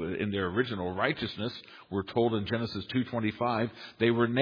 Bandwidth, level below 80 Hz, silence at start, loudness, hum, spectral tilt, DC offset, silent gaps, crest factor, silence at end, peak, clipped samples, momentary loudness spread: 5.2 kHz; -62 dBFS; 0 s; -31 LUFS; none; -8 dB/octave; under 0.1%; none; 20 dB; 0 s; -10 dBFS; under 0.1%; 8 LU